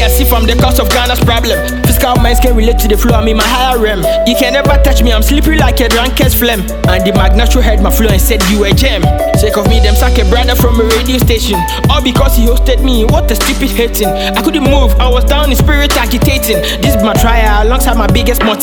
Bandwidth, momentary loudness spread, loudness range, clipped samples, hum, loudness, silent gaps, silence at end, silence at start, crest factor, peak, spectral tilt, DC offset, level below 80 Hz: 19.5 kHz; 2 LU; 1 LU; under 0.1%; none; -9 LUFS; none; 0 s; 0 s; 8 dB; 0 dBFS; -5 dB/octave; under 0.1%; -12 dBFS